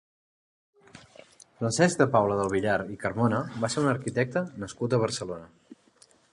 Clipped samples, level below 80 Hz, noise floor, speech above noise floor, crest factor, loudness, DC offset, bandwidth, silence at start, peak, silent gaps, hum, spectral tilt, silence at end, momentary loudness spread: under 0.1%; -60 dBFS; -60 dBFS; 34 dB; 22 dB; -27 LUFS; under 0.1%; 11.5 kHz; 0.95 s; -6 dBFS; none; none; -5.5 dB/octave; 0.6 s; 11 LU